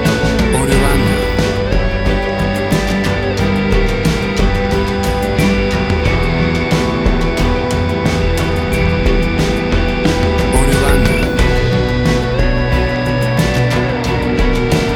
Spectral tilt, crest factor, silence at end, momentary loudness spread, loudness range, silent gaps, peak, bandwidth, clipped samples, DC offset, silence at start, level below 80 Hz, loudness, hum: -6 dB/octave; 14 dB; 0 s; 3 LU; 1 LU; none; 0 dBFS; 16.5 kHz; under 0.1%; under 0.1%; 0 s; -18 dBFS; -14 LUFS; none